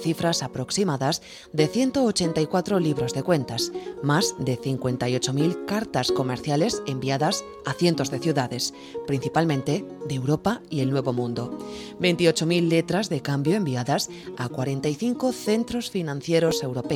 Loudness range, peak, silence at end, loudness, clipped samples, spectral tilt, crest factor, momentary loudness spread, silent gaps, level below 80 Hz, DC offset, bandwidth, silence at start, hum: 2 LU; -6 dBFS; 0 s; -25 LUFS; under 0.1%; -5 dB/octave; 18 dB; 7 LU; none; -56 dBFS; under 0.1%; 16.5 kHz; 0 s; none